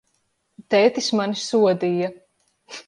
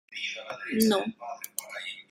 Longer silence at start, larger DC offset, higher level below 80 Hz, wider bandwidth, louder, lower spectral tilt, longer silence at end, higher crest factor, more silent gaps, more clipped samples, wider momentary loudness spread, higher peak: first, 0.6 s vs 0.1 s; neither; about the same, -72 dBFS vs -70 dBFS; second, 11.5 kHz vs 16 kHz; first, -20 LUFS vs -30 LUFS; about the same, -4.5 dB/octave vs -3.5 dB/octave; about the same, 0.05 s vs 0.05 s; second, 18 dB vs 26 dB; neither; neither; second, 9 LU vs 13 LU; about the same, -4 dBFS vs -4 dBFS